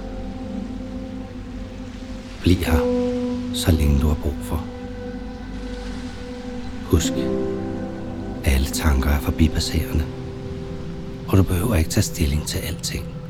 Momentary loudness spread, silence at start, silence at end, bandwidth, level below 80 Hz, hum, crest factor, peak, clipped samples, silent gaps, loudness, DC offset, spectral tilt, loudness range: 14 LU; 0 s; 0 s; 17 kHz; -28 dBFS; none; 22 dB; -2 dBFS; under 0.1%; none; -23 LUFS; under 0.1%; -5.5 dB/octave; 4 LU